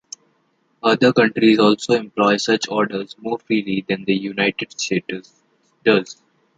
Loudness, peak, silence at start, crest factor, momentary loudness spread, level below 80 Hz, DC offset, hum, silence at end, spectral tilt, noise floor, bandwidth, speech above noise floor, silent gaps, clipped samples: -18 LUFS; -2 dBFS; 0.85 s; 18 dB; 13 LU; -62 dBFS; under 0.1%; none; 0.45 s; -4.5 dB/octave; -64 dBFS; 9.2 kHz; 46 dB; none; under 0.1%